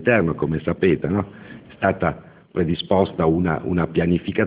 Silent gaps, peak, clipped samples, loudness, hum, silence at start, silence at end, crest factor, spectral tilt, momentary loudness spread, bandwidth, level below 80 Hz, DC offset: none; -4 dBFS; under 0.1%; -21 LUFS; none; 0 s; 0 s; 18 dB; -11.5 dB/octave; 11 LU; 4 kHz; -40 dBFS; under 0.1%